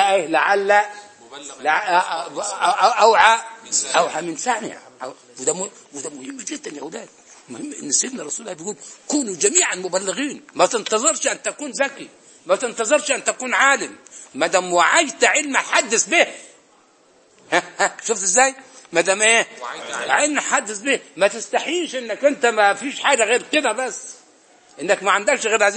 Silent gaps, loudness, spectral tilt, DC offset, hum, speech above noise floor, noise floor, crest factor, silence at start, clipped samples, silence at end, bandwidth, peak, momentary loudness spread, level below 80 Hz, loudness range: none; -18 LUFS; -1 dB/octave; under 0.1%; none; 35 dB; -55 dBFS; 20 dB; 0 s; under 0.1%; 0 s; 8.8 kHz; 0 dBFS; 17 LU; -72 dBFS; 8 LU